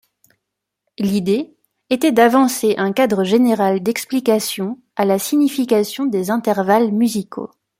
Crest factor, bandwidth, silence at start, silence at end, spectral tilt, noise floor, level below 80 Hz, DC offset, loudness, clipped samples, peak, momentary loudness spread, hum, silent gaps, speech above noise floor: 16 dB; 16.5 kHz; 1 s; 0.35 s; -5 dB/octave; -79 dBFS; -62 dBFS; under 0.1%; -17 LUFS; under 0.1%; -2 dBFS; 10 LU; none; none; 63 dB